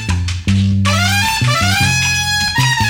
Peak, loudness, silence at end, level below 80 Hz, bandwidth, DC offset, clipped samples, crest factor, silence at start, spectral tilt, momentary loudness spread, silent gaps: -2 dBFS; -13 LUFS; 0 s; -32 dBFS; 16.5 kHz; under 0.1%; under 0.1%; 12 dB; 0 s; -3.5 dB/octave; 4 LU; none